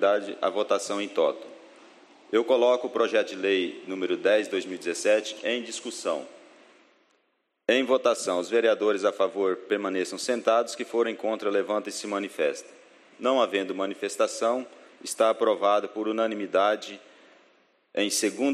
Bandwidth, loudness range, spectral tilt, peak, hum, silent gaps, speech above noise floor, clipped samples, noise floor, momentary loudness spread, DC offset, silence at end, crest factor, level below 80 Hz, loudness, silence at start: 13 kHz; 3 LU; -2.5 dB/octave; -8 dBFS; none; none; 48 dB; under 0.1%; -74 dBFS; 9 LU; under 0.1%; 0 s; 18 dB; -84 dBFS; -26 LUFS; 0 s